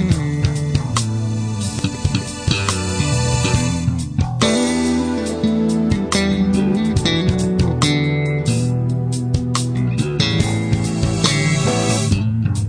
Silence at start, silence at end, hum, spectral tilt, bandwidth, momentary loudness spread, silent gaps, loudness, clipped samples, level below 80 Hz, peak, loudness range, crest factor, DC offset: 0 s; 0 s; none; -5 dB/octave; 10.5 kHz; 5 LU; none; -18 LUFS; under 0.1%; -32 dBFS; 0 dBFS; 2 LU; 18 dB; under 0.1%